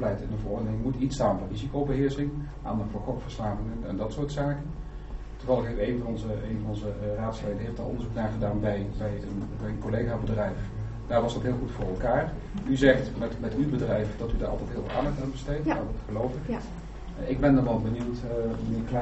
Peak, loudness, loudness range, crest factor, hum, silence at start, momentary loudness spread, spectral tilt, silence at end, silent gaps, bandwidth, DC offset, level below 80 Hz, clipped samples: -6 dBFS; -30 LUFS; 4 LU; 22 dB; none; 0 s; 8 LU; -7 dB/octave; 0 s; none; 8 kHz; under 0.1%; -38 dBFS; under 0.1%